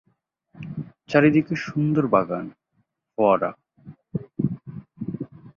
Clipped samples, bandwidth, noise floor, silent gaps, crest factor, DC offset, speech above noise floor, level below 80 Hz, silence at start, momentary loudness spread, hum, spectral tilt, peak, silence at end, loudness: under 0.1%; 7 kHz; -71 dBFS; none; 22 dB; under 0.1%; 51 dB; -60 dBFS; 0.55 s; 18 LU; none; -8.5 dB/octave; -2 dBFS; 0.05 s; -23 LUFS